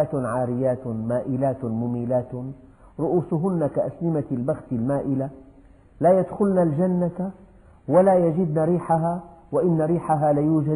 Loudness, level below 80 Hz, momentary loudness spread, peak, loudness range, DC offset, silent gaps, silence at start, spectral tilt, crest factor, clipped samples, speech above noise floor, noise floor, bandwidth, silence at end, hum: -23 LUFS; -54 dBFS; 9 LU; -6 dBFS; 4 LU; under 0.1%; none; 0 s; -10.5 dB/octave; 16 dB; under 0.1%; 28 dB; -50 dBFS; 10.5 kHz; 0 s; none